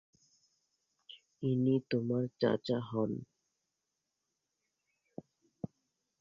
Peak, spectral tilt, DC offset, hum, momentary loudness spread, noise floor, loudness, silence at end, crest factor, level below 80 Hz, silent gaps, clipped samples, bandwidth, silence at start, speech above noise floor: -16 dBFS; -8.5 dB/octave; under 0.1%; none; 22 LU; -87 dBFS; -34 LUFS; 0.55 s; 22 dB; -74 dBFS; none; under 0.1%; 7.4 kHz; 1.1 s; 54 dB